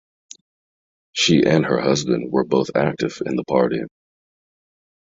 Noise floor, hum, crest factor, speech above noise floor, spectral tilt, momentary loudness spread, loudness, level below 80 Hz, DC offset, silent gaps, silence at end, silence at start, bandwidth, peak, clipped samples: under -90 dBFS; none; 20 dB; over 71 dB; -5 dB/octave; 10 LU; -19 LUFS; -56 dBFS; under 0.1%; none; 1.25 s; 1.15 s; 8.2 kHz; -2 dBFS; under 0.1%